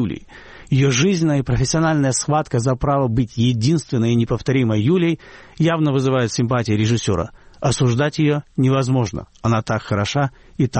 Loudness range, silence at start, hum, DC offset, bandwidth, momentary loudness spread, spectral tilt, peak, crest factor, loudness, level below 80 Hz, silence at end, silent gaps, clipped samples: 1 LU; 0 s; none; under 0.1%; 8.8 kHz; 5 LU; -6 dB/octave; -6 dBFS; 12 dB; -19 LUFS; -40 dBFS; 0 s; none; under 0.1%